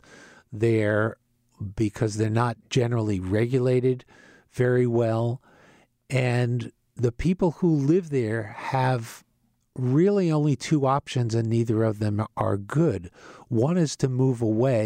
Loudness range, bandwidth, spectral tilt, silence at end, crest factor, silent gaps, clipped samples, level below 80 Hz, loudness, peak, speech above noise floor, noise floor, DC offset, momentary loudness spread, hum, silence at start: 2 LU; 10.5 kHz; -7.5 dB/octave; 0 s; 14 dB; none; under 0.1%; -52 dBFS; -25 LUFS; -10 dBFS; 45 dB; -69 dBFS; under 0.1%; 8 LU; none; 0.5 s